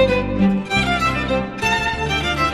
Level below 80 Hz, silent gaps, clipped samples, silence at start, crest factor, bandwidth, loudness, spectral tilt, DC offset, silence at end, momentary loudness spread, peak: -32 dBFS; none; under 0.1%; 0 s; 16 dB; 14 kHz; -19 LUFS; -5 dB/octave; 0.2%; 0 s; 3 LU; -4 dBFS